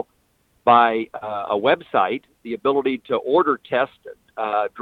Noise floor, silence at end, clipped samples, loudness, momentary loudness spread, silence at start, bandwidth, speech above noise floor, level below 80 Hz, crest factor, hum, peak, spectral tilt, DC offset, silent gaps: -64 dBFS; 0 s; under 0.1%; -21 LUFS; 13 LU; 0.65 s; 4.8 kHz; 44 dB; -64 dBFS; 20 dB; none; -2 dBFS; -7 dB/octave; under 0.1%; none